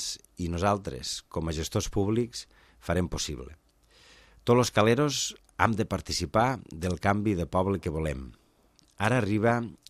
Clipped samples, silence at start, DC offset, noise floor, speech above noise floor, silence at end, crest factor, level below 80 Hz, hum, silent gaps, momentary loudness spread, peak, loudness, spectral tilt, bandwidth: under 0.1%; 0 s; under 0.1%; -63 dBFS; 36 dB; 0.15 s; 24 dB; -48 dBFS; none; none; 11 LU; -4 dBFS; -28 LUFS; -5 dB/octave; 15.5 kHz